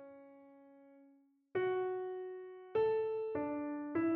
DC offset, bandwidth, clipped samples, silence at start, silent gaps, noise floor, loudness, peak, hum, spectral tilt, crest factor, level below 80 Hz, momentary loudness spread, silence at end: under 0.1%; 4.3 kHz; under 0.1%; 0 s; none; -68 dBFS; -38 LUFS; -24 dBFS; none; -5.5 dB/octave; 14 dB; -78 dBFS; 17 LU; 0 s